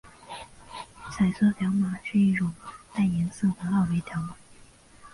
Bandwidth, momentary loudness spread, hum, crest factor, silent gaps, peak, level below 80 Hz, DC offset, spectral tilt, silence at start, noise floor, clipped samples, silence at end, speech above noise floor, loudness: 11.5 kHz; 19 LU; none; 14 dB; none; -12 dBFS; -54 dBFS; under 0.1%; -7 dB/octave; 0.05 s; -53 dBFS; under 0.1%; 0.05 s; 27 dB; -26 LUFS